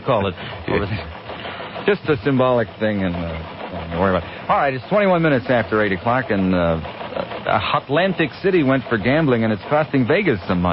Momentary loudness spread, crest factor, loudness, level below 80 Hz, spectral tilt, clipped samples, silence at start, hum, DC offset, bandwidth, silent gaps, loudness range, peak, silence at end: 11 LU; 14 dB; -19 LUFS; -40 dBFS; -11.5 dB/octave; under 0.1%; 0 s; none; under 0.1%; 5.8 kHz; none; 3 LU; -4 dBFS; 0 s